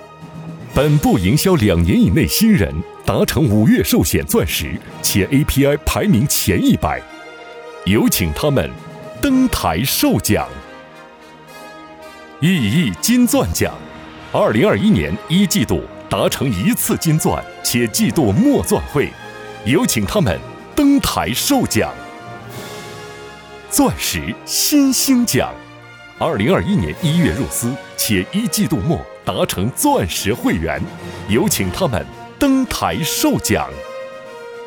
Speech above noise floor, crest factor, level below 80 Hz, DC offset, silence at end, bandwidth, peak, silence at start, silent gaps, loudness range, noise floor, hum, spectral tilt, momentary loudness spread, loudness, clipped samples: 24 dB; 14 dB; -36 dBFS; under 0.1%; 0 s; over 20 kHz; -2 dBFS; 0 s; none; 4 LU; -40 dBFS; none; -4.5 dB/octave; 19 LU; -16 LUFS; under 0.1%